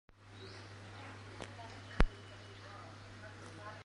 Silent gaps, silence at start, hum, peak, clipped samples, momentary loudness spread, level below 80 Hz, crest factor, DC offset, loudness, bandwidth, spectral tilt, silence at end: none; 0.1 s; none; -8 dBFS; under 0.1%; 15 LU; -44 dBFS; 34 dB; under 0.1%; -46 LUFS; 11 kHz; -5.5 dB/octave; 0 s